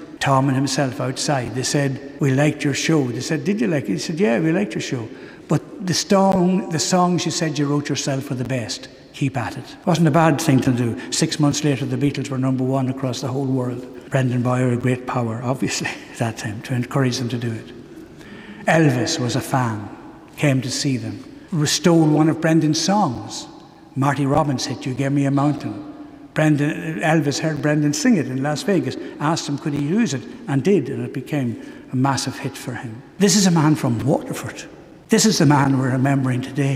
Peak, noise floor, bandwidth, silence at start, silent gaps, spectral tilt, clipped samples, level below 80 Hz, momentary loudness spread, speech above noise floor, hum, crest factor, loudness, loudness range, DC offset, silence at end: -2 dBFS; -39 dBFS; 16 kHz; 0 s; none; -5 dB/octave; under 0.1%; -54 dBFS; 13 LU; 20 dB; none; 18 dB; -20 LUFS; 4 LU; under 0.1%; 0 s